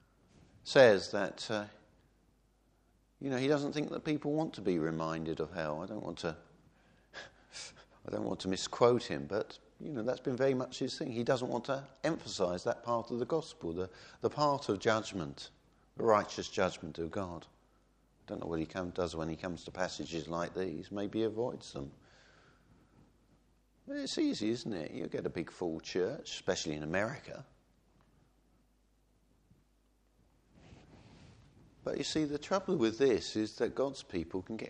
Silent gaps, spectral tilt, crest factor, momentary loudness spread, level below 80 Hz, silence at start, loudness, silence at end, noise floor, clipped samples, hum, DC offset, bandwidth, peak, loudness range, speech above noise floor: none; -5 dB/octave; 26 dB; 14 LU; -64 dBFS; 0.65 s; -35 LUFS; 0 s; -71 dBFS; under 0.1%; none; under 0.1%; 10 kHz; -10 dBFS; 7 LU; 37 dB